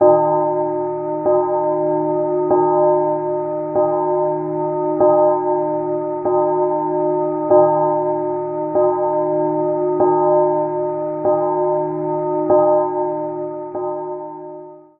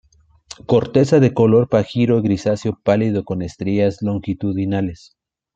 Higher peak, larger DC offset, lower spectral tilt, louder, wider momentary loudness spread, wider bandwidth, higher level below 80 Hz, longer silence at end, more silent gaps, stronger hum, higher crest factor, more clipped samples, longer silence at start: about the same, -2 dBFS vs -2 dBFS; neither; second, -5.5 dB/octave vs -8 dB/octave; about the same, -18 LUFS vs -18 LUFS; about the same, 9 LU vs 10 LU; second, 2.5 kHz vs 8.6 kHz; second, -62 dBFS vs -50 dBFS; second, 0.2 s vs 0.6 s; neither; neither; about the same, 16 dB vs 16 dB; neither; second, 0 s vs 0.5 s